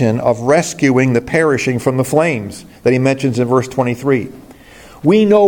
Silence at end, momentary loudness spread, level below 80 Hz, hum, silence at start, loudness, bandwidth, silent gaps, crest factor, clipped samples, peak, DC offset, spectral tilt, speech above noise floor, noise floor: 0 s; 6 LU; -48 dBFS; none; 0 s; -15 LUFS; 17.5 kHz; none; 14 dB; under 0.1%; 0 dBFS; under 0.1%; -6.5 dB/octave; 26 dB; -39 dBFS